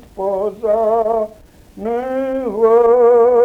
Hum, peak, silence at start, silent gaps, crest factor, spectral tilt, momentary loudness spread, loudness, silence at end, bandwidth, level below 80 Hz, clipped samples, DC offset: none; -4 dBFS; 0.15 s; none; 12 dB; -7.5 dB/octave; 12 LU; -15 LUFS; 0 s; 3.6 kHz; -48 dBFS; under 0.1%; under 0.1%